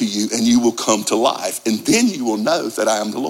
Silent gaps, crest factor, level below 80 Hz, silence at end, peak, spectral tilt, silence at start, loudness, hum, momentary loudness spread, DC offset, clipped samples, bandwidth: none; 16 dB; -60 dBFS; 0 s; -2 dBFS; -3 dB/octave; 0 s; -17 LUFS; none; 5 LU; under 0.1%; under 0.1%; 16.5 kHz